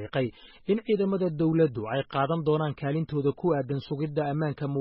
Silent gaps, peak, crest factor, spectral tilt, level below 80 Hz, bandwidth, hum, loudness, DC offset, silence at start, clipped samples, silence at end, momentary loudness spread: none; -12 dBFS; 16 dB; -7 dB/octave; -60 dBFS; 5.6 kHz; none; -28 LUFS; under 0.1%; 0 s; under 0.1%; 0 s; 5 LU